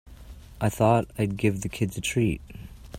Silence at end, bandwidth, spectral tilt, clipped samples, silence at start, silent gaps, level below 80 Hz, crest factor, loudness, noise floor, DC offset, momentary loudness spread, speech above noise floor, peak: 0 s; 16 kHz; -6 dB/octave; under 0.1%; 0.05 s; none; -46 dBFS; 20 dB; -26 LUFS; -45 dBFS; under 0.1%; 13 LU; 20 dB; -6 dBFS